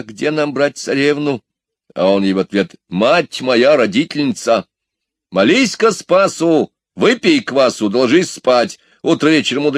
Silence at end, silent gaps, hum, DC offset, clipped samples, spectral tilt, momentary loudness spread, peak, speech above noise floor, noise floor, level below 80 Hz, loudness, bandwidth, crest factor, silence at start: 0 s; none; none; under 0.1%; under 0.1%; -4.5 dB/octave; 7 LU; 0 dBFS; 65 dB; -79 dBFS; -62 dBFS; -14 LUFS; 13.5 kHz; 14 dB; 0.1 s